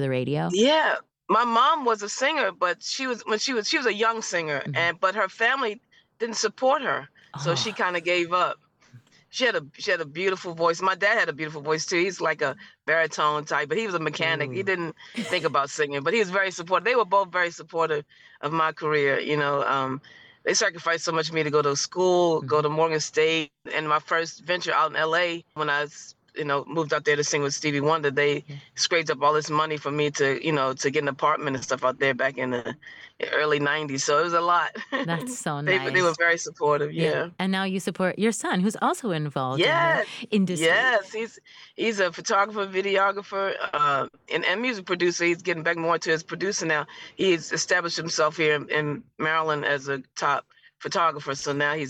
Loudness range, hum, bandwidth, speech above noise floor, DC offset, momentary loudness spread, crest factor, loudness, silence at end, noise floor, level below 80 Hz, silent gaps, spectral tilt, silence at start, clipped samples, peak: 2 LU; none; 14.5 kHz; 29 dB; under 0.1%; 7 LU; 14 dB; -24 LUFS; 0 s; -54 dBFS; -74 dBFS; none; -3.5 dB/octave; 0 s; under 0.1%; -10 dBFS